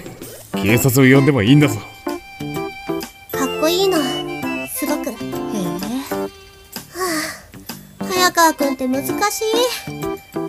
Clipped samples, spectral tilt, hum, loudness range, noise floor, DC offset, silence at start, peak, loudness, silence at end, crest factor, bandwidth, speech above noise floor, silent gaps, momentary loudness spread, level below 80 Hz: under 0.1%; -4.5 dB/octave; none; 7 LU; -38 dBFS; under 0.1%; 0 s; 0 dBFS; -18 LUFS; 0 s; 18 dB; 16 kHz; 24 dB; none; 17 LU; -50 dBFS